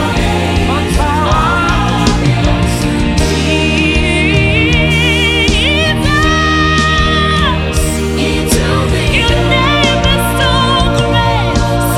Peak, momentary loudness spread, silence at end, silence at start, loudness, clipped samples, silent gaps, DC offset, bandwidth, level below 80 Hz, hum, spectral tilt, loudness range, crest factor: 0 dBFS; 3 LU; 0 s; 0 s; -11 LUFS; under 0.1%; none; under 0.1%; 16.5 kHz; -18 dBFS; none; -5 dB/octave; 2 LU; 10 dB